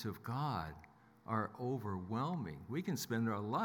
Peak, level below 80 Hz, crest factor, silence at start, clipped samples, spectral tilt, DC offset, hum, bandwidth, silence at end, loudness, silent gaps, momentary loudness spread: -22 dBFS; -70 dBFS; 18 dB; 0 s; under 0.1%; -6 dB/octave; under 0.1%; none; 18 kHz; 0 s; -41 LUFS; none; 6 LU